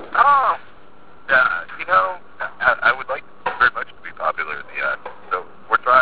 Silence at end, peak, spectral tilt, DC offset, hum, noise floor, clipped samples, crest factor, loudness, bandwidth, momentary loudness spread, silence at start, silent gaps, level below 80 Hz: 0 s; -2 dBFS; -6 dB/octave; 1%; none; -48 dBFS; under 0.1%; 18 dB; -19 LUFS; 4 kHz; 14 LU; 0 s; none; -56 dBFS